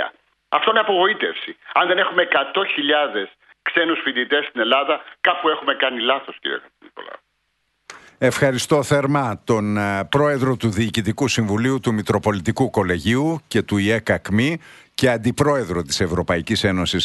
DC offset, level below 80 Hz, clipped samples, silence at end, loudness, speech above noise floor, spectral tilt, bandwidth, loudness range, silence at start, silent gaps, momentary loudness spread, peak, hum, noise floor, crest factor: under 0.1%; -48 dBFS; under 0.1%; 0 s; -19 LUFS; 50 dB; -5 dB/octave; 12 kHz; 3 LU; 0 s; none; 7 LU; -2 dBFS; none; -70 dBFS; 18 dB